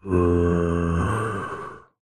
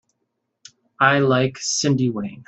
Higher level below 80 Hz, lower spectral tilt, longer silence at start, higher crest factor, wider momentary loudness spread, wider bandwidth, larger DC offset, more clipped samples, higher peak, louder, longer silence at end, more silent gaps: first, -36 dBFS vs -60 dBFS; first, -8 dB/octave vs -4.5 dB/octave; second, 0.05 s vs 1 s; about the same, 16 dB vs 20 dB; first, 14 LU vs 5 LU; first, 10 kHz vs 8.4 kHz; neither; neither; second, -8 dBFS vs -2 dBFS; second, -23 LUFS vs -19 LUFS; first, 0.35 s vs 0.05 s; neither